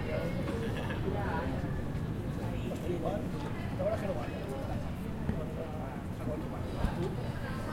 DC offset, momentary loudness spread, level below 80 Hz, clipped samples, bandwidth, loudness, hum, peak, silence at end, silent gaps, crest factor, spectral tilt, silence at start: under 0.1%; 4 LU; -44 dBFS; under 0.1%; 16.5 kHz; -36 LUFS; none; -16 dBFS; 0 s; none; 18 dB; -7.5 dB/octave; 0 s